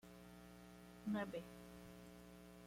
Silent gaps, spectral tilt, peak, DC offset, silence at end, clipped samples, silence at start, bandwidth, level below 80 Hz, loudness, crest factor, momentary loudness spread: none; -6 dB/octave; -32 dBFS; under 0.1%; 0 s; under 0.1%; 0.05 s; 16.5 kHz; -72 dBFS; -52 LUFS; 20 dB; 15 LU